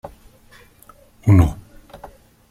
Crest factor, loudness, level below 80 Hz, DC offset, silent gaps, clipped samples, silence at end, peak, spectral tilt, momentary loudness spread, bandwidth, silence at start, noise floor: 20 dB; -17 LUFS; -34 dBFS; under 0.1%; none; under 0.1%; 0.95 s; -2 dBFS; -8.5 dB/octave; 27 LU; 13 kHz; 0.05 s; -49 dBFS